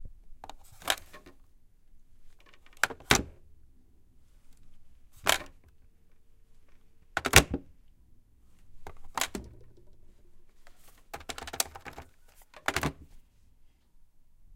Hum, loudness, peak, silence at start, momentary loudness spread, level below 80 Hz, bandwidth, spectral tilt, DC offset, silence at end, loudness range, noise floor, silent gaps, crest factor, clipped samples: none; -29 LUFS; 0 dBFS; 0 s; 30 LU; -48 dBFS; 17 kHz; -2 dB/octave; under 0.1%; 0 s; 12 LU; -58 dBFS; none; 36 dB; under 0.1%